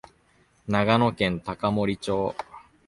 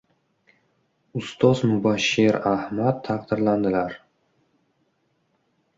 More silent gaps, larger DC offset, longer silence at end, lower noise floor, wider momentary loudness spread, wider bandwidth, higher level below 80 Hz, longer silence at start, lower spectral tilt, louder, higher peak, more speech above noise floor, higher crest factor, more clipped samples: neither; neither; second, 0.3 s vs 1.8 s; second, -62 dBFS vs -69 dBFS; first, 16 LU vs 13 LU; first, 11.5 kHz vs 7.8 kHz; first, -52 dBFS vs -58 dBFS; second, 0.65 s vs 1.15 s; about the same, -6.5 dB/octave vs -6 dB/octave; second, -25 LUFS vs -22 LUFS; about the same, -4 dBFS vs -4 dBFS; second, 38 dB vs 48 dB; about the same, 22 dB vs 20 dB; neither